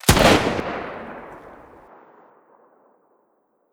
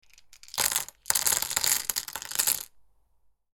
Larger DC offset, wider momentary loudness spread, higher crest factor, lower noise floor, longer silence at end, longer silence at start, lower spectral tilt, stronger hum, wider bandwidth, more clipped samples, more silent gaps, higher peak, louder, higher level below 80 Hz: neither; first, 27 LU vs 8 LU; second, 24 dB vs 30 dB; about the same, -66 dBFS vs -66 dBFS; first, 2.2 s vs 0.7 s; second, 0.05 s vs 0.3 s; first, -4 dB/octave vs 1.5 dB/octave; neither; about the same, over 20 kHz vs 19 kHz; neither; neither; about the same, 0 dBFS vs -2 dBFS; first, -19 LUFS vs -26 LUFS; first, -36 dBFS vs -60 dBFS